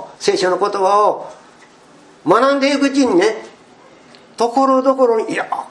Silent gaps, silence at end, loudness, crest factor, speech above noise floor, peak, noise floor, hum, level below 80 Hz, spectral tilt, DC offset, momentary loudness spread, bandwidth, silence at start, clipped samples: none; 0.05 s; -15 LUFS; 16 dB; 31 dB; 0 dBFS; -45 dBFS; none; -66 dBFS; -4 dB/octave; under 0.1%; 8 LU; 11.5 kHz; 0 s; under 0.1%